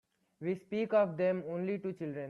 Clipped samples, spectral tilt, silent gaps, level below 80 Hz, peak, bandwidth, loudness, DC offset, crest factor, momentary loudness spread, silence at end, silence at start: under 0.1%; -9 dB/octave; none; -80 dBFS; -18 dBFS; 6.8 kHz; -34 LUFS; under 0.1%; 18 dB; 9 LU; 0 s; 0.4 s